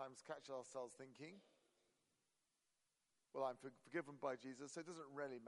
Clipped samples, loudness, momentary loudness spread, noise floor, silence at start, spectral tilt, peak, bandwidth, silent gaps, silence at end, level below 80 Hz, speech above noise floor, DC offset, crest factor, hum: under 0.1%; -52 LUFS; 11 LU; -88 dBFS; 0 s; -4.5 dB/octave; -32 dBFS; 11.5 kHz; none; 0 s; under -90 dBFS; 37 dB; under 0.1%; 22 dB; none